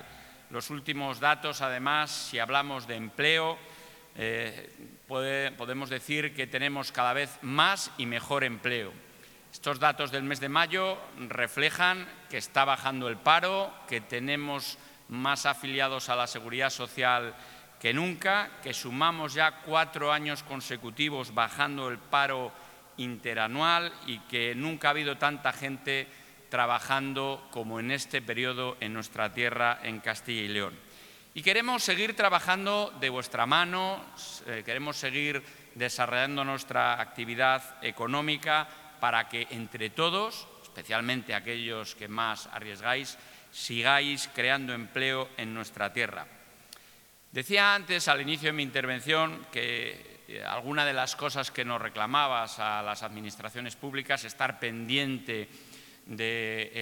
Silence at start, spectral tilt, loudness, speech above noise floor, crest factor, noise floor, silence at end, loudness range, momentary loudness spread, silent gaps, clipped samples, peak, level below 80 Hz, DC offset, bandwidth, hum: 0 s; -3 dB/octave; -29 LUFS; 27 dB; 26 dB; -57 dBFS; 0 s; 4 LU; 13 LU; none; under 0.1%; -6 dBFS; -72 dBFS; under 0.1%; 19.5 kHz; none